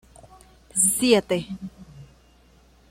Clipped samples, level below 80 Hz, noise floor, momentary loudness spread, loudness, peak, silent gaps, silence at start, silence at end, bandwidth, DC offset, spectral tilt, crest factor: under 0.1%; -54 dBFS; -55 dBFS; 19 LU; -21 LUFS; -6 dBFS; none; 0.75 s; 0.85 s; 16.5 kHz; under 0.1%; -3 dB/octave; 22 dB